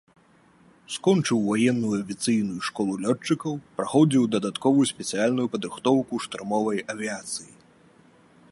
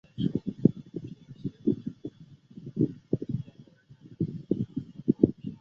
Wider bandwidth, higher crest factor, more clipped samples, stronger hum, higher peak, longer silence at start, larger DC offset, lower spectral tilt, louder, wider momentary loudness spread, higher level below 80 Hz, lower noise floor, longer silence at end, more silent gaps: first, 11.5 kHz vs 6.6 kHz; second, 18 dB vs 28 dB; neither; neither; second, -8 dBFS vs -4 dBFS; first, 0.9 s vs 0.15 s; neither; second, -5 dB/octave vs -11 dB/octave; first, -25 LUFS vs -31 LUFS; second, 10 LU vs 18 LU; second, -68 dBFS vs -58 dBFS; first, -58 dBFS vs -54 dBFS; first, 1.05 s vs 0.05 s; neither